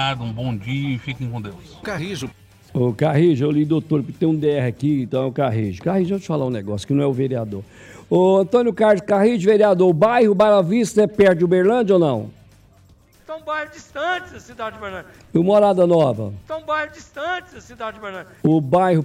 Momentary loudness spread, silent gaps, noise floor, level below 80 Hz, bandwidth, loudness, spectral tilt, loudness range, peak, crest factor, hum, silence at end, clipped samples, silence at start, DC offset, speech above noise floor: 16 LU; none; -51 dBFS; -54 dBFS; 14 kHz; -19 LUFS; -7 dB/octave; 7 LU; -4 dBFS; 14 dB; none; 0 s; under 0.1%; 0 s; under 0.1%; 33 dB